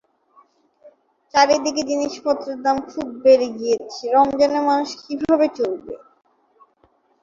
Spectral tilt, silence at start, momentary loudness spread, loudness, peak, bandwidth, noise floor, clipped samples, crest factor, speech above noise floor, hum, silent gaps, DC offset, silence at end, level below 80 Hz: -3.5 dB/octave; 0.85 s; 11 LU; -19 LUFS; -2 dBFS; 7.6 kHz; -61 dBFS; under 0.1%; 20 dB; 42 dB; none; none; under 0.1%; 1.25 s; -60 dBFS